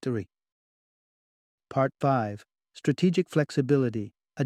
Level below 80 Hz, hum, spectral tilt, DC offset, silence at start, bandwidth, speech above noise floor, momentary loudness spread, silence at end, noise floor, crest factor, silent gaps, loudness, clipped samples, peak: -68 dBFS; none; -7.5 dB/octave; under 0.1%; 0.05 s; 12.5 kHz; over 64 dB; 13 LU; 0 s; under -90 dBFS; 18 dB; 0.52-1.58 s; -27 LUFS; under 0.1%; -10 dBFS